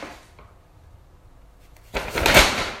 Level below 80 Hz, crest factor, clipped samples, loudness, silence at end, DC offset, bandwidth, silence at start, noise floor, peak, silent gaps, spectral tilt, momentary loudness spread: -36 dBFS; 24 dB; under 0.1%; -17 LUFS; 0 s; under 0.1%; 16 kHz; 0 s; -50 dBFS; 0 dBFS; none; -2.5 dB/octave; 19 LU